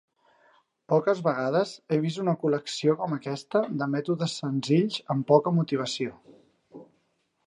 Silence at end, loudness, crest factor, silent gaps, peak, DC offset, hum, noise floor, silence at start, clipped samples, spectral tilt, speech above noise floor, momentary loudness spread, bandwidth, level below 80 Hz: 0.65 s; -27 LUFS; 22 dB; none; -6 dBFS; under 0.1%; none; -73 dBFS; 0.9 s; under 0.1%; -6.5 dB/octave; 47 dB; 8 LU; 11 kHz; -74 dBFS